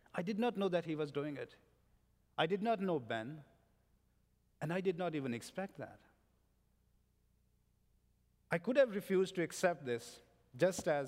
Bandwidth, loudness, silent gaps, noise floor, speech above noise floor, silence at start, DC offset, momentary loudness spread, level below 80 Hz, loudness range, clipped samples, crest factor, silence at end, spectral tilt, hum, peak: 16 kHz; -38 LUFS; none; -75 dBFS; 38 dB; 0.15 s; under 0.1%; 15 LU; -76 dBFS; 8 LU; under 0.1%; 22 dB; 0 s; -5.5 dB/octave; 60 Hz at -70 dBFS; -18 dBFS